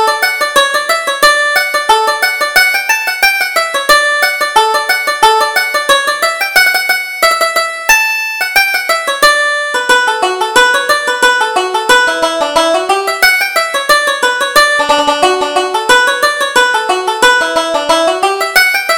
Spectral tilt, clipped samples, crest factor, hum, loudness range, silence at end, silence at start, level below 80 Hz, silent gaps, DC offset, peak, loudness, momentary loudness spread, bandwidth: 0 dB/octave; 0.2%; 10 dB; none; 1 LU; 0 s; 0 s; -44 dBFS; none; under 0.1%; 0 dBFS; -10 LUFS; 4 LU; over 20 kHz